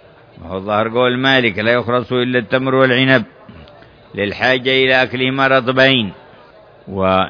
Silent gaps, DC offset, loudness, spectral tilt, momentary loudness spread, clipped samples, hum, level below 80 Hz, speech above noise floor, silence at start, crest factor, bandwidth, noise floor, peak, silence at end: none; under 0.1%; -14 LUFS; -6.5 dB/octave; 11 LU; under 0.1%; none; -52 dBFS; 29 dB; 0.35 s; 16 dB; 5.4 kHz; -43 dBFS; 0 dBFS; 0 s